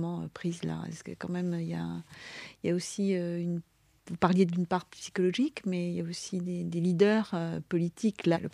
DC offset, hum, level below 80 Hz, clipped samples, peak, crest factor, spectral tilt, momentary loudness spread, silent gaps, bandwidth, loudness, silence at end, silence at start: under 0.1%; none; -68 dBFS; under 0.1%; -8 dBFS; 22 dB; -6.5 dB/octave; 13 LU; none; 11.5 kHz; -31 LUFS; 0.05 s; 0 s